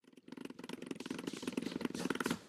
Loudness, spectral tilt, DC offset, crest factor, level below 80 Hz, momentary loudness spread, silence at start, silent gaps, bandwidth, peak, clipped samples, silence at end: -43 LUFS; -4.5 dB/octave; under 0.1%; 22 dB; -76 dBFS; 12 LU; 0.05 s; none; 15.5 kHz; -20 dBFS; under 0.1%; 0 s